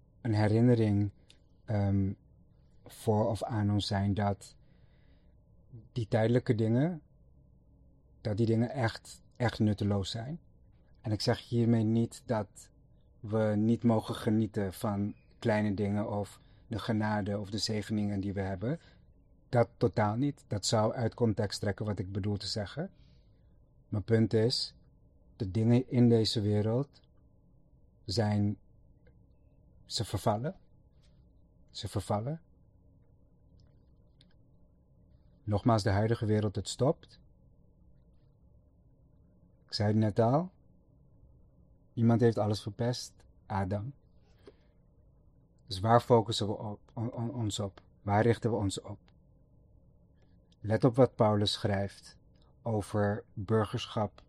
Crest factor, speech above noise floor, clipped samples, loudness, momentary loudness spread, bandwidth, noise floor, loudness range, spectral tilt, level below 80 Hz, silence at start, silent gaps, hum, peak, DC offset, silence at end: 24 dB; 33 dB; under 0.1%; -31 LUFS; 14 LU; 12.5 kHz; -63 dBFS; 7 LU; -6.5 dB/octave; -60 dBFS; 0.25 s; none; none; -8 dBFS; under 0.1%; 0.2 s